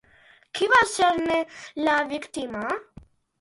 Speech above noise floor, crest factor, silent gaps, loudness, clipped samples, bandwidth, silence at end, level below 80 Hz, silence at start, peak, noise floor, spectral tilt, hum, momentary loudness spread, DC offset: 33 dB; 20 dB; none; -24 LUFS; under 0.1%; 11.5 kHz; 0.6 s; -58 dBFS; 0.55 s; -4 dBFS; -56 dBFS; -2.5 dB/octave; none; 14 LU; under 0.1%